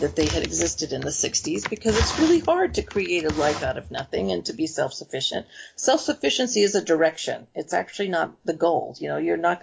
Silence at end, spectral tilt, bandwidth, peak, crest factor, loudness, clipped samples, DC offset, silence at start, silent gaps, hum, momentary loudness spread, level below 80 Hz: 0.05 s; -3.5 dB/octave; 8 kHz; -8 dBFS; 16 dB; -24 LUFS; under 0.1%; under 0.1%; 0 s; none; none; 8 LU; -40 dBFS